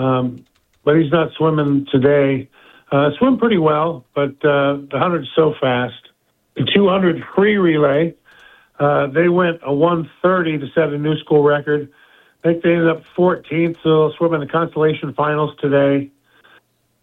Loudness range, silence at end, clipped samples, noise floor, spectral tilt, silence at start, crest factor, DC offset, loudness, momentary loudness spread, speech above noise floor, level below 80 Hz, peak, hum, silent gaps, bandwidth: 1 LU; 0.95 s; under 0.1%; -58 dBFS; -9.5 dB/octave; 0 s; 16 dB; under 0.1%; -17 LUFS; 7 LU; 42 dB; -56 dBFS; 0 dBFS; none; none; 4.1 kHz